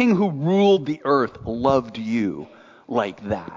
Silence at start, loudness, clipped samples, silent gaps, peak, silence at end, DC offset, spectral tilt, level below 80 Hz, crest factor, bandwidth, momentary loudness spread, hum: 0 s; -21 LUFS; under 0.1%; none; -6 dBFS; 0 s; under 0.1%; -7.5 dB/octave; -52 dBFS; 16 dB; 7.6 kHz; 10 LU; none